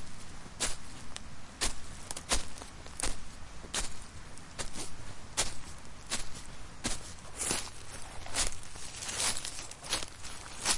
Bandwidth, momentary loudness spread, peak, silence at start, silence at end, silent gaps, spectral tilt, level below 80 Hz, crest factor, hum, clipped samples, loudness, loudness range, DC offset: 11.5 kHz; 15 LU; -12 dBFS; 0 s; 0 s; none; -1 dB/octave; -46 dBFS; 22 dB; none; under 0.1%; -37 LUFS; 4 LU; under 0.1%